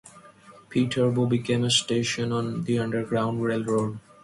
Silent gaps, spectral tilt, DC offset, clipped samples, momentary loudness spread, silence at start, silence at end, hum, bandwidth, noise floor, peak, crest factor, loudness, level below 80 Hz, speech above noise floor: none; -5 dB/octave; under 0.1%; under 0.1%; 6 LU; 0.05 s; 0.25 s; none; 11.5 kHz; -51 dBFS; -8 dBFS; 16 dB; -25 LUFS; -60 dBFS; 26 dB